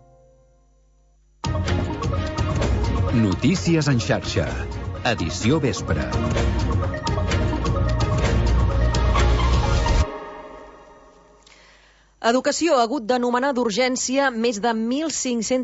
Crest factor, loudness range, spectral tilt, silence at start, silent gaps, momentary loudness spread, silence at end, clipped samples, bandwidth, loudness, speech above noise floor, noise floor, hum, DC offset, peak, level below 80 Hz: 14 dB; 4 LU; -5.5 dB/octave; 1.45 s; none; 6 LU; 0 s; under 0.1%; 8 kHz; -22 LUFS; 36 dB; -57 dBFS; none; under 0.1%; -6 dBFS; -28 dBFS